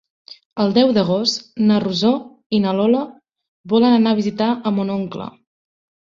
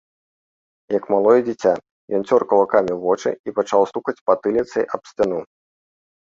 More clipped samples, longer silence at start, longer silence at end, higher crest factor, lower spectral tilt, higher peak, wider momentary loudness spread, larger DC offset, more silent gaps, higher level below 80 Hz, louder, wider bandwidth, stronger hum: neither; second, 0.3 s vs 0.9 s; about the same, 0.8 s vs 0.8 s; about the same, 16 dB vs 18 dB; about the same, -6 dB/octave vs -6 dB/octave; about the same, -2 dBFS vs -2 dBFS; about the same, 11 LU vs 9 LU; neither; about the same, 0.45-0.50 s, 2.46-2.50 s, 3.48-3.64 s vs 1.91-2.08 s, 3.39-3.44 s, 4.21-4.26 s; about the same, -60 dBFS vs -60 dBFS; about the same, -18 LUFS vs -20 LUFS; about the same, 7.6 kHz vs 7.6 kHz; neither